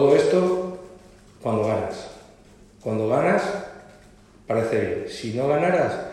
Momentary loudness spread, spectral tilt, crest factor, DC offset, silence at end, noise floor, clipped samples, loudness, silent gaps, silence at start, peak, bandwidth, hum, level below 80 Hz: 14 LU; -6.5 dB/octave; 18 dB; under 0.1%; 0 s; -51 dBFS; under 0.1%; -23 LUFS; none; 0 s; -6 dBFS; 12 kHz; none; -56 dBFS